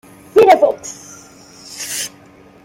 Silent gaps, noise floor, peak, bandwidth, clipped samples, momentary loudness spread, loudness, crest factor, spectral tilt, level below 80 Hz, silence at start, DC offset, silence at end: none; -44 dBFS; 0 dBFS; 16.5 kHz; under 0.1%; 24 LU; -14 LUFS; 16 dB; -2.5 dB/octave; -58 dBFS; 0.35 s; under 0.1%; 0.55 s